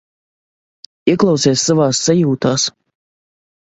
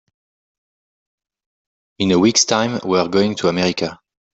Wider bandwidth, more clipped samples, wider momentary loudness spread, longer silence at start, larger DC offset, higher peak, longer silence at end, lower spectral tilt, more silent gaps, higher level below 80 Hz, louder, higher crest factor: about the same, 8.2 kHz vs 8.2 kHz; neither; second, 5 LU vs 9 LU; second, 1.05 s vs 2 s; neither; about the same, 0 dBFS vs -2 dBFS; first, 1.1 s vs 0.45 s; about the same, -4.5 dB/octave vs -4 dB/octave; neither; about the same, -56 dBFS vs -56 dBFS; first, -14 LUFS vs -17 LUFS; about the same, 16 dB vs 18 dB